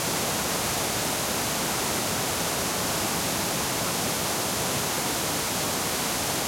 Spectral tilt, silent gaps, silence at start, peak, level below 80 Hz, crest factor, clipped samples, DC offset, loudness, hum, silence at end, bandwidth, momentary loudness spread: -2 dB/octave; none; 0 s; -14 dBFS; -50 dBFS; 14 dB; under 0.1%; under 0.1%; -25 LUFS; none; 0 s; 16.5 kHz; 0 LU